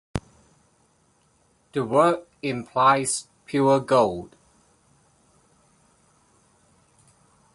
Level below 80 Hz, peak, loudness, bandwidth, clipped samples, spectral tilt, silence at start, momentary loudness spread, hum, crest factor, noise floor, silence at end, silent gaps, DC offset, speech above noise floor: -54 dBFS; -6 dBFS; -23 LUFS; 11.5 kHz; under 0.1%; -5 dB/octave; 0.15 s; 16 LU; none; 20 dB; -64 dBFS; 3.3 s; none; under 0.1%; 42 dB